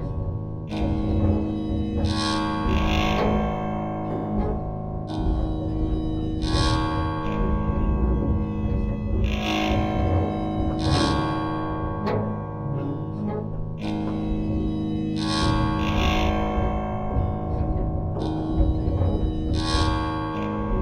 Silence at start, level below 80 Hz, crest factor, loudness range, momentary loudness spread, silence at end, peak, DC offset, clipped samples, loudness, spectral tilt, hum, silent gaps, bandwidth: 0 s; -30 dBFS; 16 dB; 3 LU; 6 LU; 0 s; -8 dBFS; under 0.1%; under 0.1%; -25 LUFS; -6.5 dB/octave; none; none; 11 kHz